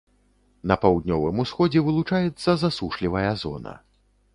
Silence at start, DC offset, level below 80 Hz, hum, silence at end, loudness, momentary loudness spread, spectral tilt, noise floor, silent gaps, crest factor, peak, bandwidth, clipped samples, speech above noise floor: 0.65 s; under 0.1%; -46 dBFS; none; 0.6 s; -23 LUFS; 11 LU; -7.5 dB/octave; -62 dBFS; none; 22 dB; -2 dBFS; 11 kHz; under 0.1%; 40 dB